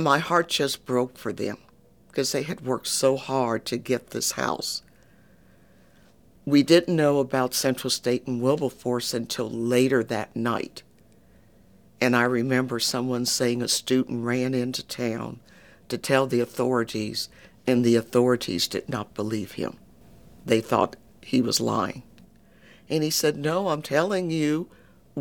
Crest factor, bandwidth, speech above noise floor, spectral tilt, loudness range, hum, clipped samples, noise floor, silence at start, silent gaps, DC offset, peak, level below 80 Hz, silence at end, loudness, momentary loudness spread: 20 dB; 19 kHz; 32 dB; -4 dB/octave; 4 LU; none; under 0.1%; -57 dBFS; 0 s; none; under 0.1%; -6 dBFS; -62 dBFS; 0 s; -25 LUFS; 11 LU